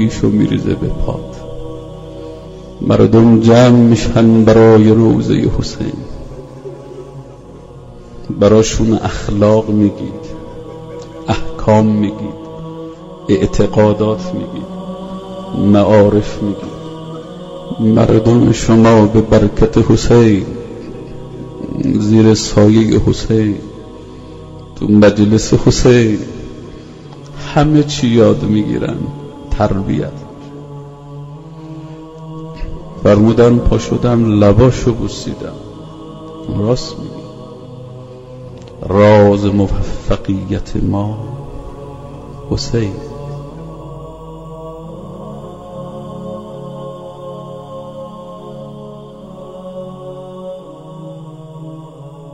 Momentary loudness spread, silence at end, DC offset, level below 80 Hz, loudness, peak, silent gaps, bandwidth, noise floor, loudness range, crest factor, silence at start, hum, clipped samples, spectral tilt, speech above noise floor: 23 LU; 0 s; under 0.1%; -28 dBFS; -12 LUFS; 0 dBFS; none; 8 kHz; -34 dBFS; 18 LU; 14 dB; 0 s; none; under 0.1%; -7 dB/octave; 24 dB